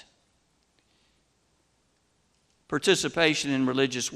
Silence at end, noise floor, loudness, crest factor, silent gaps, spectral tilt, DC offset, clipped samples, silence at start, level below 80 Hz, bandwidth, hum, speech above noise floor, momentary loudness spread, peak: 0 s; -70 dBFS; -25 LUFS; 22 dB; none; -3.5 dB/octave; under 0.1%; under 0.1%; 2.7 s; -66 dBFS; 14.5 kHz; none; 45 dB; 4 LU; -6 dBFS